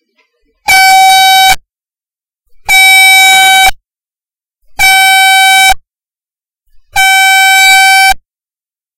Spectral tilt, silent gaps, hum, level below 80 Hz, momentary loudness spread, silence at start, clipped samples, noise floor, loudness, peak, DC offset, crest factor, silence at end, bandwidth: 2.5 dB/octave; none; none; -34 dBFS; 10 LU; 0.65 s; under 0.1%; under -90 dBFS; -3 LUFS; 0 dBFS; under 0.1%; 8 dB; 0.8 s; 17 kHz